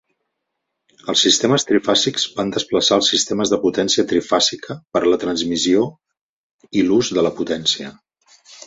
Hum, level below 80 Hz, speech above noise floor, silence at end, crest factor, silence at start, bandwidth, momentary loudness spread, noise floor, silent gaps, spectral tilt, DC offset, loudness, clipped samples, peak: none; -56 dBFS; 59 dB; 0 s; 16 dB; 1.05 s; 8.2 kHz; 9 LU; -77 dBFS; 6.21-6.59 s; -3 dB/octave; under 0.1%; -17 LUFS; under 0.1%; -2 dBFS